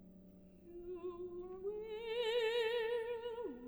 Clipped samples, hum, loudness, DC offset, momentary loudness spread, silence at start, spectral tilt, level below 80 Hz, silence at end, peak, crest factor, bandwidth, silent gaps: under 0.1%; none; -41 LUFS; under 0.1%; 23 LU; 0 s; -4 dB/octave; -68 dBFS; 0 s; -26 dBFS; 14 dB; over 20 kHz; none